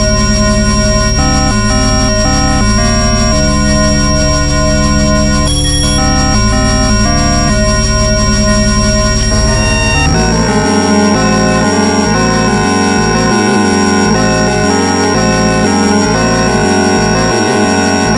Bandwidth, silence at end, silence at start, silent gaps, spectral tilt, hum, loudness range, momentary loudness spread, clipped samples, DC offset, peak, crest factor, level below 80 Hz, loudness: 11.5 kHz; 0 s; 0 s; none; -4.5 dB/octave; none; 0 LU; 1 LU; under 0.1%; under 0.1%; 0 dBFS; 10 dB; -16 dBFS; -10 LUFS